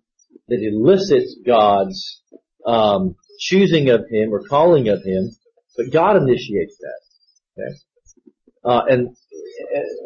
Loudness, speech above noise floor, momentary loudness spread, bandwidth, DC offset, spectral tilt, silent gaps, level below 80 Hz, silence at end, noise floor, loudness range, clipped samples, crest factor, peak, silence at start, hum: -17 LUFS; 44 dB; 18 LU; 7 kHz; under 0.1%; -6.5 dB/octave; none; -52 dBFS; 0 s; -61 dBFS; 6 LU; under 0.1%; 16 dB; -2 dBFS; 0.5 s; none